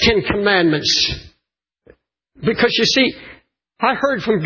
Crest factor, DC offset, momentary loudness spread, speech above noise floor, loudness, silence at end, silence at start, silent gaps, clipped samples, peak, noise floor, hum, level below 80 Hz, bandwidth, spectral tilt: 18 dB; under 0.1%; 8 LU; 60 dB; -16 LUFS; 0 s; 0 s; none; under 0.1%; 0 dBFS; -76 dBFS; none; -40 dBFS; 7.2 kHz; -3.5 dB/octave